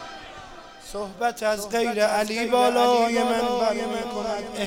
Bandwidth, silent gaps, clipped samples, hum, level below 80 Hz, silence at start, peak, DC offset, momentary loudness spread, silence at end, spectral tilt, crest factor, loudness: 16.5 kHz; none; under 0.1%; none; -54 dBFS; 0 s; -8 dBFS; under 0.1%; 20 LU; 0 s; -3.5 dB/octave; 16 dB; -23 LUFS